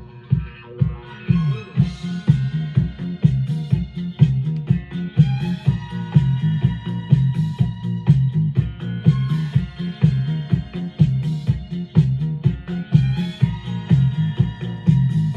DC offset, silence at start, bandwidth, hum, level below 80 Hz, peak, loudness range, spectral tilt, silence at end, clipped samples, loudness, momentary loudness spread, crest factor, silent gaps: under 0.1%; 0 s; 6.8 kHz; none; -38 dBFS; -2 dBFS; 1 LU; -9 dB/octave; 0 s; under 0.1%; -20 LUFS; 6 LU; 18 dB; none